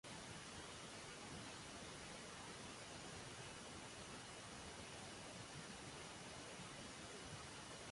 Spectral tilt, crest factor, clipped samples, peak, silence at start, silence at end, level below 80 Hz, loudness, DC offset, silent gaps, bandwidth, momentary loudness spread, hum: -3 dB/octave; 14 dB; under 0.1%; -40 dBFS; 0.05 s; 0 s; -70 dBFS; -53 LUFS; under 0.1%; none; 11.5 kHz; 1 LU; none